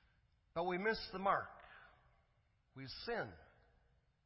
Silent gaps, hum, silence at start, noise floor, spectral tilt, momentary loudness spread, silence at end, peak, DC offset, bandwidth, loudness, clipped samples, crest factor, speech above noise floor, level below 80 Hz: none; none; 0.55 s; -77 dBFS; -7.5 dB/octave; 22 LU; 0.8 s; -22 dBFS; under 0.1%; 5.8 kHz; -41 LUFS; under 0.1%; 22 dB; 36 dB; -68 dBFS